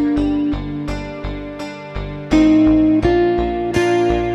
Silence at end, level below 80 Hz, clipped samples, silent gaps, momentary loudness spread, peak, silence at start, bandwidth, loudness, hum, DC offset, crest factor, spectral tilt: 0 s; -30 dBFS; under 0.1%; none; 16 LU; -2 dBFS; 0 s; 10.5 kHz; -16 LUFS; none; under 0.1%; 14 dB; -7 dB/octave